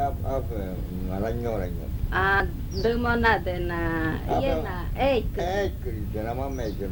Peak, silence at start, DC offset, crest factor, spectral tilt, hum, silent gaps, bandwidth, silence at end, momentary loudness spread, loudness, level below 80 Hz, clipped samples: -8 dBFS; 0 s; under 0.1%; 18 dB; -7 dB/octave; none; none; 19 kHz; 0 s; 9 LU; -27 LUFS; -32 dBFS; under 0.1%